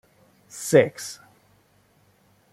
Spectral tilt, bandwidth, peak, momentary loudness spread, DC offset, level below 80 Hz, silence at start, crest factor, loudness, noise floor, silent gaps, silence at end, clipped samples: -5 dB/octave; 16 kHz; -2 dBFS; 24 LU; under 0.1%; -68 dBFS; 0.55 s; 24 dB; -22 LUFS; -61 dBFS; none; 1.4 s; under 0.1%